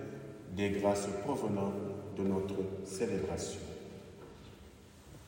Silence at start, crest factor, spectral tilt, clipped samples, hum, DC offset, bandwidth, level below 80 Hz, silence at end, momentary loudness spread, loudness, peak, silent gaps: 0 s; 20 dB; -6 dB/octave; under 0.1%; none; under 0.1%; 16 kHz; -64 dBFS; 0 s; 21 LU; -37 LUFS; -18 dBFS; none